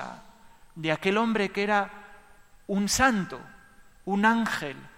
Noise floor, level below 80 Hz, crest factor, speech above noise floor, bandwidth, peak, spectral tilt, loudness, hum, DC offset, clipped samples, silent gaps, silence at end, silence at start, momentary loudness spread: -54 dBFS; -54 dBFS; 20 dB; 28 dB; 16.5 kHz; -8 dBFS; -4 dB/octave; -26 LUFS; none; under 0.1%; under 0.1%; none; 0.05 s; 0 s; 15 LU